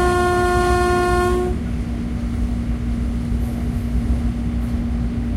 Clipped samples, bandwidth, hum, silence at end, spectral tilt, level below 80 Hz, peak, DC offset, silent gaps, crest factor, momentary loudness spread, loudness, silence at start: under 0.1%; 14 kHz; none; 0 s; -6.5 dB/octave; -24 dBFS; -6 dBFS; under 0.1%; none; 14 dB; 7 LU; -21 LUFS; 0 s